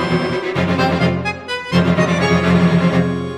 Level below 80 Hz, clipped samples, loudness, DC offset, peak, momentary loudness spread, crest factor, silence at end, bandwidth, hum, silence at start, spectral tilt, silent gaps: -42 dBFS; under 0.1%; -16 LUFS; under 0.1%; -2 dBFS; 6 LU; 14 dB; 0 s; 10 kHz; none; 0 s; -6.5 dB/octave; none